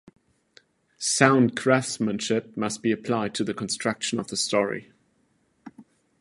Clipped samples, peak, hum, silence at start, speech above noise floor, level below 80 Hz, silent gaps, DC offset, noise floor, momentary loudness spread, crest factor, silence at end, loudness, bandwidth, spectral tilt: under 0.1%; 0 dBFS; none; 1 s; 43 dB; -66 dBFS; none; under 0.1%; -68 dBFS; 10 LU; 26 dB; 0.4 s; -24 LUFS; 11.5 kHz; -4 dB/octave